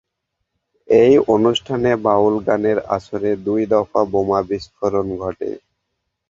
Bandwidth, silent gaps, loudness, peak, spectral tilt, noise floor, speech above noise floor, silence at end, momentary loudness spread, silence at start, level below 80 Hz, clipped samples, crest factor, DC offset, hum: 7.6 kHz; none; -17 LUFS; 0 dBFS; -6.5 dB/octave; -76 dBFS; 59 dB; 0.75 s; 12 LU; 0.9 s; -50 dBFS; under 0.1%; 18 dB; under 0.1%; none